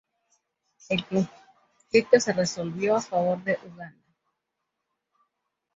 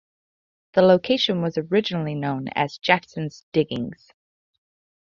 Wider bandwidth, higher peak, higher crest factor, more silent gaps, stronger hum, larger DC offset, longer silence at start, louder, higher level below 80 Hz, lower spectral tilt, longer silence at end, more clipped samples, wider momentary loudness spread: first, 8 kHz vs 7.2 kHz; about the same, -6 dBFS vs -4 dBFS; about the same, 24 dB vs 20 dB; second, none vs 3.43-3.52 s; neither; neither; first, 0.9 s vs 0.75 s; second, -25 LUFS vs -22 LUFS; about the same, -66 dBFS vs -62 dBFS; second, -4.5 dB/octave vs -6.5 dB/octave; first, 1.85 s vs 1.1 s; neither; about the same, 14 LU vs 12 LU